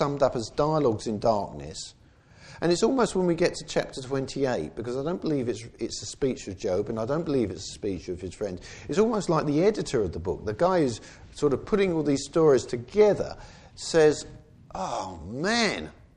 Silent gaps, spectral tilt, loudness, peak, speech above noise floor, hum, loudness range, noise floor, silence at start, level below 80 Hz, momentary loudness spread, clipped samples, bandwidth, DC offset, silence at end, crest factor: none; -5.5 dB/octave; -27 LUFS; -8 dBFS; 27 dB; none; 5 LU; -53 dBFS; 0 s; -50 dBFS; 13 LU; under 0.1%; 10.5 kHz; under 0.1%; 0.25 s; 18 dB